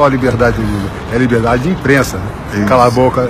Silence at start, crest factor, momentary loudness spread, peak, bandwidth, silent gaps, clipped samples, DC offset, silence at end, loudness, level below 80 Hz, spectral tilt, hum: 0 s; 12 dB; 9 LU; 0 dBFS; 15.5 kHz; none; under 0.1%; under 0.1%; 0 s; -12 LUFS; -28 dBFS; -6.5 dB/octave; none